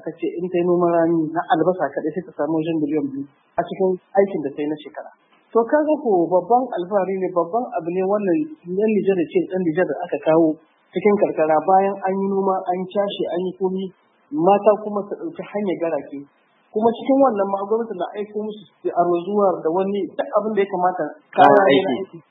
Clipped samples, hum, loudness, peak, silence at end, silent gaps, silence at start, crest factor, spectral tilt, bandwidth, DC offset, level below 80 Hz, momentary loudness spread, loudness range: under 0.1%; none; -20 LUFS; 0 dBFS; 0.1 s; none; 0.05 s; 20 dB; -9.5 dB/octave; 4 kHz; under 0.1%; -72 dBFS; 11 LU; 3 LU